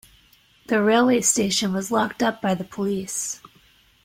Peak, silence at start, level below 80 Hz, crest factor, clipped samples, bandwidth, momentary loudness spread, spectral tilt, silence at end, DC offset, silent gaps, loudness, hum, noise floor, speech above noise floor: -6 dBFS; 0.7 s; -60 dBFS; 18 dB; under 0.1%; 16.5 kHz; 9 LU; -3.5 dB/octave; 0.7 s; under 0.1%; none; -22 LUFS; none; -57 dBFS; 35 dB